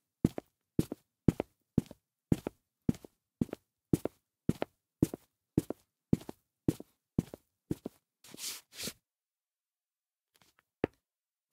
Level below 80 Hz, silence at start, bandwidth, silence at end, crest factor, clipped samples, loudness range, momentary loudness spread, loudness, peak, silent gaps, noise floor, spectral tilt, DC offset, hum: -56 dBFS; 0.25 s; 16.5 kHz; 0.65 s; 30 dB; under 0.1%; 8 LU; 15 LU; -37 LUFS; -6 dBFS; none; under -90 dBFS; -6.5 dB/octave; under 0.1%; none